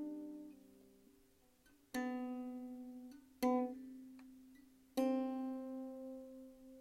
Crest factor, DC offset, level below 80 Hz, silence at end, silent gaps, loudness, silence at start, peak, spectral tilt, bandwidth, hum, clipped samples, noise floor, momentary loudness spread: 20 dB; under 0.1%; -78 dBFS; 0 s; none; -43 LUFS; 0 s; -26 dBFS; -4.5 dB/octave; 16 kHz; none; under 0.1%; -71 dBFS; 20 LU